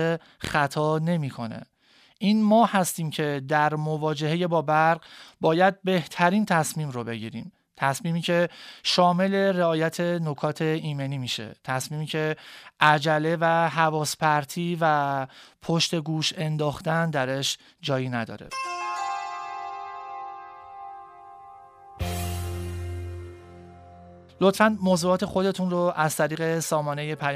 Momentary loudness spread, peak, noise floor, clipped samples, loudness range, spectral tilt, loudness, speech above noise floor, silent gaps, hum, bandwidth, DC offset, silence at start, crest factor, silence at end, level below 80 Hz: 15 LU; -4 dBFS; -59 dBFS; under 0.1%; 12 LU; -5 dB/octave; -25 LUFS; 35 dB; none; none; 15.5 kHz; under 0.1%; 0 s; 22 dB; 0 s; -54 dBFS